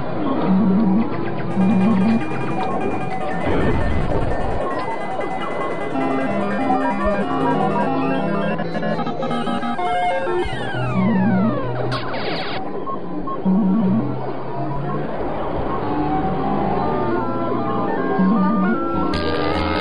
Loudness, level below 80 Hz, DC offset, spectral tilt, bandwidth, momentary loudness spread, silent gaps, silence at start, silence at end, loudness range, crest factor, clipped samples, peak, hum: -21 LUFS; -36 dBFS; 5%; -8 dB/octave; 9.8 kHz; 8 LU; none; 0 s; 0 s; 3 LU; 14 dB; under 0.1%; -6 dBFS; none